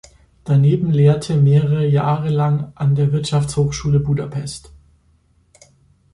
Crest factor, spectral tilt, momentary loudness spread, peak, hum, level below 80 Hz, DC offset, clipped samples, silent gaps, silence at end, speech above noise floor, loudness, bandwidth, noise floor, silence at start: 14 dB; -7.5 dB/octave; 10 LU; -4 dBFS; none; -44 dBFS; under 0.1%; under 0.1%; none; 1.55 s; 41 dB; -17 LUFS; 11 kHz; -57 dBFS; 0.45 s